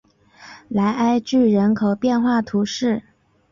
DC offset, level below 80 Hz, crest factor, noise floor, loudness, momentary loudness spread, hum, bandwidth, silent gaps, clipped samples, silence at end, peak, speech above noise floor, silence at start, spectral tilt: under 0.1%; -56 dBFS; 12 dB; -46 dBFS; -19 LUFS; 6 LU; none; 7.4 kHz; none; under 0.1%; 0.5 s; -8 dBFS; 28 dB; 0.4 s; -6.5 dB/octave